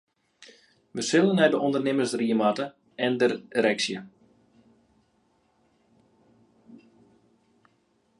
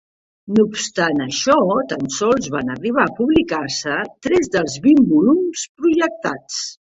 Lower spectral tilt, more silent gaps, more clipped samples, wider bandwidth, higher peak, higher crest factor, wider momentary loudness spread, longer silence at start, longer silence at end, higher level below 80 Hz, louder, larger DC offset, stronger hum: about the same, -4.5 dB/octave vs -4.5 dB/octave; second, none vs 5.69-5.75 s; neither; first, 11.5 kHz vs 8.2 kHz; second, -8 dBFS vs -2 dBFS; first, 22 dB vs 16 dB; about the same, 11 LU vs 10 LU; about the same, 0.4 s vs 0.45 s; first, 1.45 s vs 0.2 s; second, -76 dBFS vs -50 dBFS; second, -25 LUFS vs -18 LUFS; neither; neither